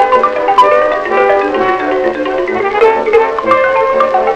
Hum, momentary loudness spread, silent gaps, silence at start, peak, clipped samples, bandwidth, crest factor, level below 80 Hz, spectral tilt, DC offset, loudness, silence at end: none; 5 LU; none; 0 s; 0 dBFS; 0.7%; 10 kHz; 10 dB; -44 dBFS; -5 dB/octave; under 0.1%; -11 LUFS; 0 s